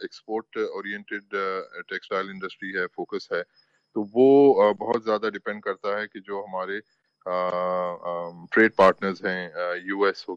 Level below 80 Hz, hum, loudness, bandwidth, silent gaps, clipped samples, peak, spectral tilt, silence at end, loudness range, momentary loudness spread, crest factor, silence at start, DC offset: -72 dBFS; none; -25 LUFS; 7.6 kHz; none; under 0.1%; -8 dBFS; -6.5 dB/octave; 0 s; 8 LU; 16 LU; 18 dB; 0 s; under 0.1%